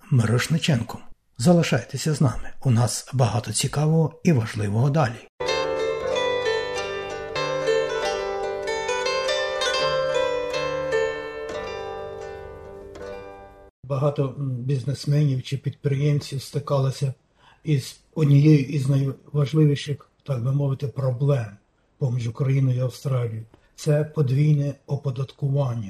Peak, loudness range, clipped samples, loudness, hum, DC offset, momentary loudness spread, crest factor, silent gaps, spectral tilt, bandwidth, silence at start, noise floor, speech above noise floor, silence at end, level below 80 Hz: -6 dBFS; 6 LU; under 0.1%; -24 LUFS; none; under 0.1%; 12 LU; 18 dB; 5.29-5.38 s, 13.70-13.83 s; -6 dB/octave; 13.5 kHz; 0.05 s; -43 dBFS; 21 dB; 0 s; -50 dBFS